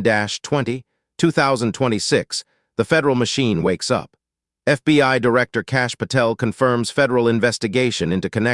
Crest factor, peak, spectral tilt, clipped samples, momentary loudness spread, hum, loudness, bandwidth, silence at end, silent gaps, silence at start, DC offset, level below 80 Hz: 16 dB; -2 dBFS; -5 dB/octave; under 0.1%; 6 LU; none; -19 LUFS; 12 kHz; 0 s; none; 0 s; under 0.1%; -54 dBFS